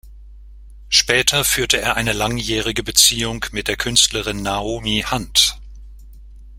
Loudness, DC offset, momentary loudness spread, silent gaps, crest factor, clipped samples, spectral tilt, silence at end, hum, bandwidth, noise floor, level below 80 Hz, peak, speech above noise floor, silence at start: -16 LUFS; under 0.1%; 10 LU; none; 20 dB; under 0.1%; -1.5 dB/octave; 0 s; none; 16.5 kHz; -39 dBFS; -36 dBFS; 0 dBFS; 21 dB; 0.05 s